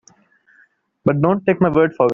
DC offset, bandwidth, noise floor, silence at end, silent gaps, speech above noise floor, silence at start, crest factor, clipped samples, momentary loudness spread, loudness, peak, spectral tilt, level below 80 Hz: under 0.1%; 7 kHz; -56 dBFS; 0 s; none; 41 dB; 1.05 s; 16 dB; under 0.1%; 5 LU; -17 LUFS; -2 dBFS; -7.5 dB/octave; -52 dBFS